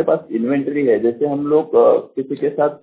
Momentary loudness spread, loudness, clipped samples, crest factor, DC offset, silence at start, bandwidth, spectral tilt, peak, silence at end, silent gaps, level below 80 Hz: 8 LU; -17 LUFS; under 0.1%; 14 dB; under 0.1%; 0 s; 4 kHz; -11.5 dB/octave; -2 dBFS; 0.05 s; none; -62 dBFS